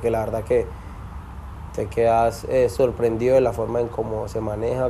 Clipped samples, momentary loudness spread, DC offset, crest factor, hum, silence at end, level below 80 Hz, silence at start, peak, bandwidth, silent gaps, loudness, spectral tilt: under 0.1%; 19 LU; under 0.1%; 16 dB; none; 0 s; -38 dBFS; 0 s; -6 dBFS; 14 kHz; none; -22 LUFS; -7 dB/octave